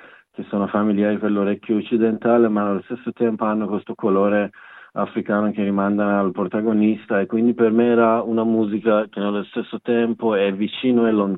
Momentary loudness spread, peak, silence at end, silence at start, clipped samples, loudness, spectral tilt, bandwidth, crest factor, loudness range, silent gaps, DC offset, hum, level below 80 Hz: 9 LU; -4 dBFS; 0 s; 0.4 s; under 0.1%; -20 LUFS; -11 dB/octave; 4.1 kHz; 16 dB; 3 LU; none; under 0.1%; none; -76 dBFS